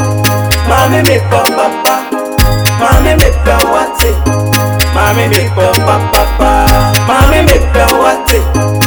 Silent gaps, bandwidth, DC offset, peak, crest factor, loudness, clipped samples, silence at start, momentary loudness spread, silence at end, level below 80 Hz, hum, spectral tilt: none; over 20 kHz; under 0.1%; 0 dBFS; 8 dB; -9 LUFS; 0.9%; 0 s; 3 LU; 0 s; -14 dBFS; none; -4.5 dB/octave